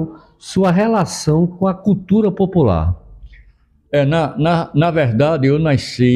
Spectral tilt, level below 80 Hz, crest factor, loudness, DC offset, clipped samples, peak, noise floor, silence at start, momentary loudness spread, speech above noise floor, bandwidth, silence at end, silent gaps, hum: -7 dB/octave; -40 dBFS; 14 dB; -16 LUFS; under 0.1%; under 0.1%; -2 dBFS; -51 dBFS; 0 s; 6 LU; 37 dB; 12 kHz; 0 s; none; none